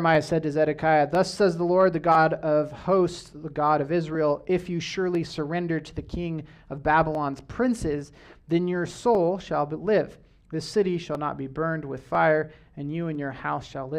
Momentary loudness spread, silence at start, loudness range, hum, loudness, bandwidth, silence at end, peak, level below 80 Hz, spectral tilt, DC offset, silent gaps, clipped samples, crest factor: 12 LU; 0 s; 5 LU; none; -25 LUFS; 12 kHz; 0 s; -6 dBFS; -50 dBFS; -6.5 dB/octave; under 0.1%; none; under 0.1%; 18 dB